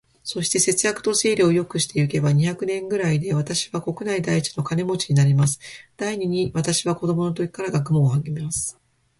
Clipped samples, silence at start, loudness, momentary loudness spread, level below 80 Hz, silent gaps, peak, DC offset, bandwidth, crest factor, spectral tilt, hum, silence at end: under 0.1%; 0.25 s; -22 LUFS; 8 LU; -54 dBFS; none; -6 dBFS; under 0.1%; 11.5 kHz; 16 dB; -5 dB/octave; none; 0.5 s